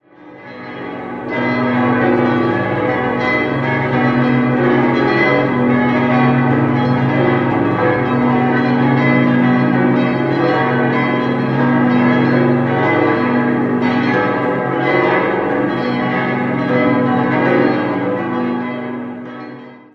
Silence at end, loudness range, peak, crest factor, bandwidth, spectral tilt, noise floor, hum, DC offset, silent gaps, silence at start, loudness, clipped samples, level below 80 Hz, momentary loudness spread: 0.15 s; 2 LU; -2 dBFS; 14 dB; 6 kHz; -9 dB/octave; -37 dBFS; none; under 0.1%; none; 0.2 s; -15 LUFS; under 0.1%; -48 dBFS; 8 LU